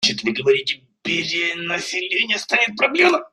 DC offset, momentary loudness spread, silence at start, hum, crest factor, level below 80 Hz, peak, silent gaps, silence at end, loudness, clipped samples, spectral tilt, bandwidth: under 0.1%; 7 LU; 0 s; none; 18 dB; -64 dBFS; -2 dBFS; none; 0.05 s; -19 LUFS; under 0.1%; -2.5 dB/octave; 12.5 kHz